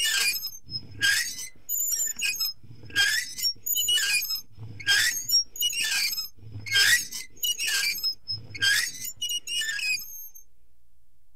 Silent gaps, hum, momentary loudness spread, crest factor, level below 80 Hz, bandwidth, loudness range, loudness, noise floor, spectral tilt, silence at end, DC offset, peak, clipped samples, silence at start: none; none; 13 LU; 20 dB; -60 dBFS; 16 kHz; 3 LU; -24 LUFS; -65 dBFS; 2 dB/octave; 0.95 s; 0.7%; -8 dBFS; under 0.1%; 0 s